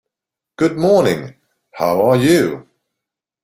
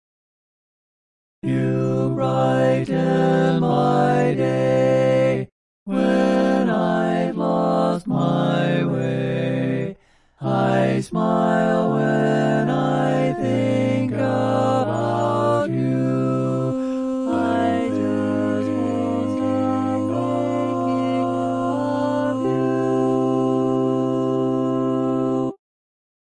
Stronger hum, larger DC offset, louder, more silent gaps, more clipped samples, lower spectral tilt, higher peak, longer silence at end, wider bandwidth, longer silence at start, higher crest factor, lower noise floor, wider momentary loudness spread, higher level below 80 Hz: neither; neither; first, -15 LUFS vs -20 LUFS; second, none vs 5.52-5.86 s; neither; second, -6 dB/octave vs -8 dB/octave; first, -2 dBFS vs -6 dBFS; about the same, 0.8 s vs 0.7 s; first, 16.5 kHz vs 11 kHz; second, 0.6 s vs 1.45 s; about the same, 16 dB vs 14 dB; first, -85 dBFS vs -48 dBFS; first, 12 LU vs 5 LU; about the same, -54 dBFS vs -56 dBFS